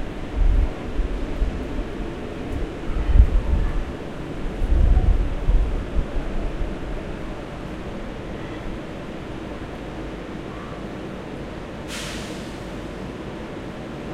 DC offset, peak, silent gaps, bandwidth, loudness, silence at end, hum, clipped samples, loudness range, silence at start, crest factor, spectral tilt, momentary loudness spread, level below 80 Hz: under 0.1%; -2 dBFS; none; 10.5 kHz; -28 LUFS; 0 s; none; under 0.1%; 9 LU; 0 s; 22 dB; -6.5 dB/octave; 12 LU; -24 dBFS